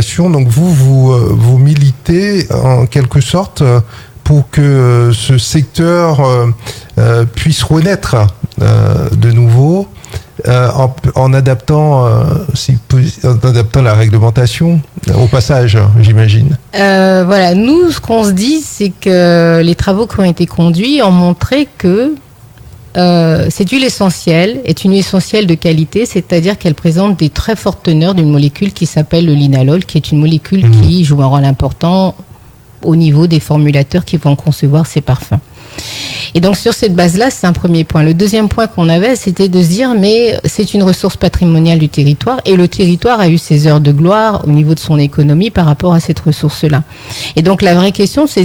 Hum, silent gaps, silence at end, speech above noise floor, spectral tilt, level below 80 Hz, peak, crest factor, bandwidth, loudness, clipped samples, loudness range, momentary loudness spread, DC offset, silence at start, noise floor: none; none; 0 s; 28 dB; -6.5 dB/octave; -32 dBFS; 0 dBFS; 8 dB; 19 kHz; -9 LUFS; under 0.1%; 3 LU; 6 LU; under 0.1%; 0 s; -36 dBFS